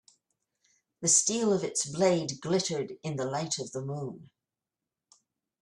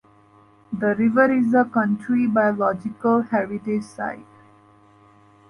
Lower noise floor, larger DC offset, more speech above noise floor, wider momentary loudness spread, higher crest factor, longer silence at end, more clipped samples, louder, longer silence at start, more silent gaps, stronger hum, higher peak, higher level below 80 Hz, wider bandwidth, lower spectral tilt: first, -90 dBFS vs -53 dBFS; neither; first, 60 dB vs 33 dB; about the same, 13 LU vs 13 LU; first, 22 dB vs 16 dB; first, 1.4 s vs 1.25 s; neither; second, -29 LUFS vs -21 LUFS; first, 1 s vs 0.7 s; neither; neither; second, -10 dBFS vs -6 dBFS; second, -72 dBFS vs -64 dBFS; first, 13 kHz vs 10.5 kHz; second, -3.5 dB/octave vs -8.5 dB/octave